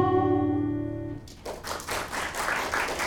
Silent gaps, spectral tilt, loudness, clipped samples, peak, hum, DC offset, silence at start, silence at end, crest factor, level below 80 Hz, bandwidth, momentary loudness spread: none; -5 dB/octave; -29 LUFS; under 0.1%; -10 dBFS; none; under 0.1%; 0 s; 0 s; 18 dB; -48 dBFS; 18 kHz; 14 LU